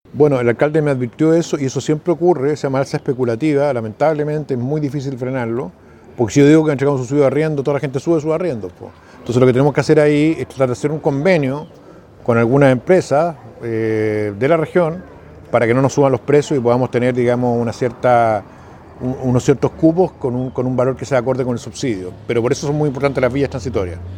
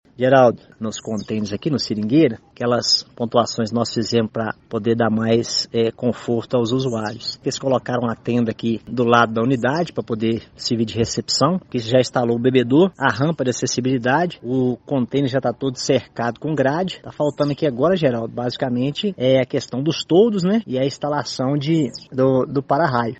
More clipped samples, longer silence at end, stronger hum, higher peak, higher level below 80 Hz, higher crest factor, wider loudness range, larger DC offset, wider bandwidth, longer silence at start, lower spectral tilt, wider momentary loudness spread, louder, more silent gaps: neither; about the same, 0 s vs 0.05 s; neither; about the same, 0 dBFS vs 0 dBFS; first, -46 dBFS vs -56 dBFS; about the same, 16 dB vs 20 dB; about the same, 3 LU vs 2 LU; neither; first, 11 kHz vs 8.4 kHz; about the same, 0.15 s vs 0.2 s; first, -7 dB/octave vs -5.5 dB/octave; about the same, 9 LU vs 8 LU; first, -16 LUFS vs -20 LUFS; neither